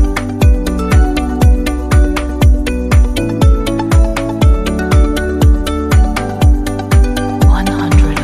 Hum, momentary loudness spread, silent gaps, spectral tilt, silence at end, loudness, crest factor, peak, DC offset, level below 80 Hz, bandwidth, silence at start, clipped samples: none; 3 LU; none; -6.5 dB/octave; 0 s; -13 LUFS; 10 dB; 0 dBFS; under 0.1%; -12 dBFS; 15 kHz; 0 s; under 0.1%